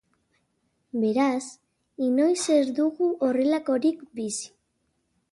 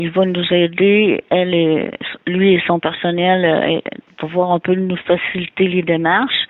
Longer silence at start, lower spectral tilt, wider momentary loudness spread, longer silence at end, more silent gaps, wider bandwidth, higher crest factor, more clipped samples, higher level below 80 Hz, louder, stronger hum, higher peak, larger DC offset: first, 0.95 s vs 0 s; second, -4 dB/octave vs -9.5 dB/octave; first, 11 LU vs 8 LU; first, 0.85 s vs 0.05 s; neither; first, 11.5 kHz vs 4.1 kHz; about the same, 16 dB vs 14 dB; neither; second, -74 dBFS vs -56 dBFS; second, -25 LUFS vs -16 LUFS; neither; second, -10 dBFS vs -2 dBFS; neither